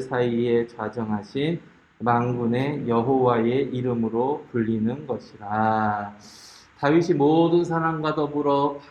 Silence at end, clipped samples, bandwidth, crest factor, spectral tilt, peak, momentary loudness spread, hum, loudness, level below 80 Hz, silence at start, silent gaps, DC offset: 0.05 s; under 0.1%; 9 kHz; 18 dB; -8 dB/octave; -6 dBFS; 10 LU; none; -23 LUFS; -60 dBFS; 0 s; none; under 0.1%